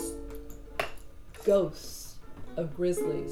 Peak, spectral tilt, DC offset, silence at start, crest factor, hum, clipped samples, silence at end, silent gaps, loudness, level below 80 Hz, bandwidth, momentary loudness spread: -14 dBFS; -5 dB/octave; under 0.1%; 0 s; 18 dB; none; under 0.1%; 0 s; none; -32 LUFS; -48 dBFS; 19.5 kHz; 20 LU